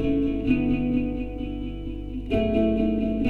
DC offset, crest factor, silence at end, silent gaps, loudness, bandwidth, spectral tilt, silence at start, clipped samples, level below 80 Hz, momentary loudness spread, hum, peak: under 0.1%; 14 dB; 0 s; none; -25 LUFS; 4.5 kHz; -9.5 dB/octave; 0 s; under 0.1%; -34 dBFS; 11 LU; 50 Hz at -35 dBFS; -10 dBFS